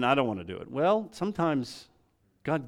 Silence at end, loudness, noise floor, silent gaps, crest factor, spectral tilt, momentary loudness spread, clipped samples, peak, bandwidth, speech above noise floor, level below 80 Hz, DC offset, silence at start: 0 s; -29 LUFS; -68 dBFS; none; 20 dB; -6.5 dB/octave; 13 LU; under 0.1%; -10 dBFS; 14.5 kHz; 40 dB; -66 dBFS; under 0.1%; 0 s